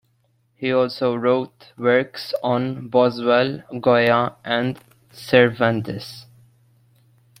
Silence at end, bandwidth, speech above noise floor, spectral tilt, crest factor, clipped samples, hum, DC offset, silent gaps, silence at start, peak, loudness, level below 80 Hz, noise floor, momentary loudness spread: 1.15 s; 15.5 kHz; 44 dB; -6.5 dB/octave; 20 dB; under 0.1%; none; under 0.1%; none; 0.6 s; -2 dBFS; -20 LUFS; -62 dBFS; -64 dBFS; 15 LU